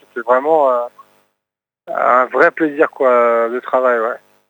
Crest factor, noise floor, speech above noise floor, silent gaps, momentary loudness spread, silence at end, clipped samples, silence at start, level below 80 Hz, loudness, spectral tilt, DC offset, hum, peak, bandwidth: 16 dB; -83 dBFS; 69 dB; none; 7 LU; 0.35 s; under 0.1%; 0.15 s; -80 dBFS; -14 LUFS; -6 dB/octave; under 0.1%; 50 Hz at -70 dBFS; 0 dBFS; 19 kHz